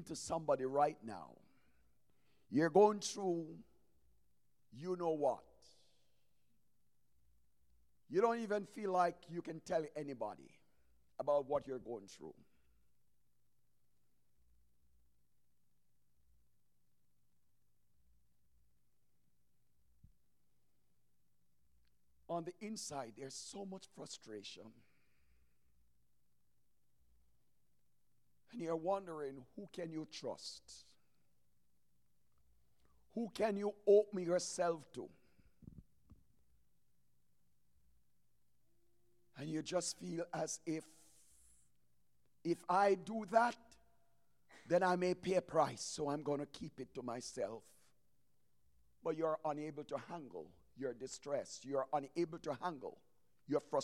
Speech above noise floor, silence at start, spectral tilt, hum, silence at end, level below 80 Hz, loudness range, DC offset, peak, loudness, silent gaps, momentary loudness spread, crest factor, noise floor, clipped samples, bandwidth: 44 dB; 0 s; -5 dB/octave; none; 0 s; -78 dBFS; 14 LU; under 0.1%; -18 dBFS; -40 LUFS; none; 18 LU; 26 dB; -83 dBFS; under 0.1%; 13 kHz